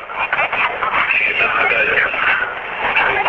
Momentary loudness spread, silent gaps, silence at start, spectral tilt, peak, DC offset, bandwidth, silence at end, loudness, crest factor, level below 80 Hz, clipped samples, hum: 5 LU; none; 0 s; -4.5 dB/octave; -2 dBFS; under 0.1%; 7.4 kHz; 0 s; -15 LUFS; 16 dB; -48 dBFS; under 0.1%; none